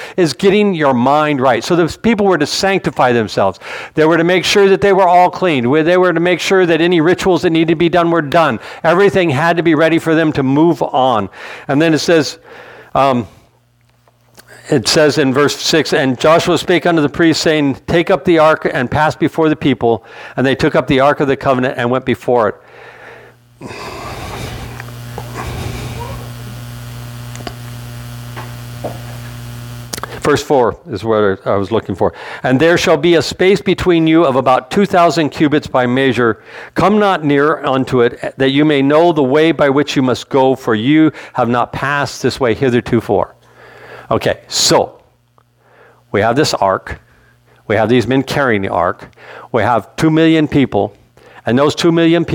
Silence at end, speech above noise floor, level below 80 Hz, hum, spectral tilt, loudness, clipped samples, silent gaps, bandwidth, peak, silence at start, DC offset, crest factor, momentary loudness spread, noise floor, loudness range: 0 s; 41 dB; -42 dBFS; none; -5.5 dB/octave; -13 LUFS; under 0.1%; none; 18.5 kHz; 0 dBFS; 0 s; under 0.1%; 12 dB; 16 LU; -53 dBFS; 12 LU